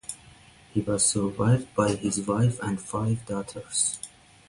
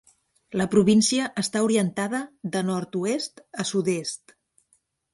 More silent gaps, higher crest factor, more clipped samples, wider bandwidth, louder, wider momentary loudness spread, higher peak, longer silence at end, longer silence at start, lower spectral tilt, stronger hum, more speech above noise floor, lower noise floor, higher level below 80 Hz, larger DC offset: neither; about the same, 18 dB vs 20 dB; neither; about the same, 11.5 kHz vs 11.5 kHz; about the same, -26 LUFS vs -24 LUFS; about the same, 12 LU vs 12 LU; about the same, -8 dBFS vs -6 dBFS; second, 0.4 s vs 0.95 s; second, 0.1 s vs 0.5 s; about the same, -5 dB/octave vs -4.5 dB/octave; neither; second, 27 dB vs 44 dB; second, -53 dBFS vs -68 dBFS; first, -54 dBFS vs -64 dBFS; neither